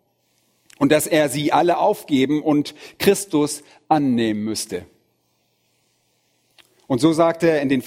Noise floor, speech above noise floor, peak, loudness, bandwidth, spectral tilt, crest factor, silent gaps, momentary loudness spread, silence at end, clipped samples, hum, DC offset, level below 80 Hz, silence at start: -67 dBFS; 48 dB; -2 dBFS; -19 LUFS; 16.5 kHz; -5 dB/octave; 20 dB; none; 9 LU; 0 s; under 0.1%; none; under 0.1%; -60 dBFS; 0.8 s